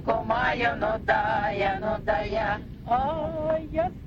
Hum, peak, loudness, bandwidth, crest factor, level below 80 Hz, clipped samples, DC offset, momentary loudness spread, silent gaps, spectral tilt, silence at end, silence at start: none; -10 dBFS; -26 LUFS; 7.4 kHz; 16 dB; -42 dBFS; under 0.1%; under 0.1%; 5 LU; none; -7 dB/octave; 0 s; 0 s